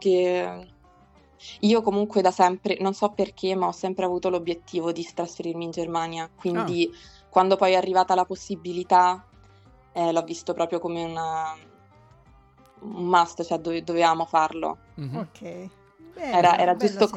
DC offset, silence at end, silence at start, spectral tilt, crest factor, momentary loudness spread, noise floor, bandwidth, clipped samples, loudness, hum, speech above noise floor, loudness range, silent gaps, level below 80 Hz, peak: under 0.1%; 0 s; 0 s; -5.5 dB/octave; 20 dB; 15 LU; -56 dBFS; 10 kHz; under 0.1%; -24 LUFS; none; 32 dB; 5 LU; none; -62 dBFS; -6 dBFS